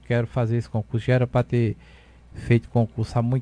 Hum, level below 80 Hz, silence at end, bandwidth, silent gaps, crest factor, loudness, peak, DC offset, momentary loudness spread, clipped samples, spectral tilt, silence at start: none; -46 dBFS; 0 s; 9.6 kHz; none; 18 dB; -24 LUFS; -6 dBFS; under 0.1%; 6 LU; under 0.1%; -8.5 dB/octave; 0.1 s